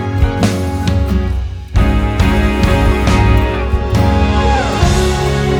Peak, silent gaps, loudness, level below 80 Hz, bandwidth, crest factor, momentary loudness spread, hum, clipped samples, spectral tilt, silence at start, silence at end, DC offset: 0 dBFS; none; -14 LUFS; -16 dBFS; 16 kHz; 12 dB; 5 LU; none; under 0.1%; -6 dB/octave; 0 s; 0 s; under 0.1%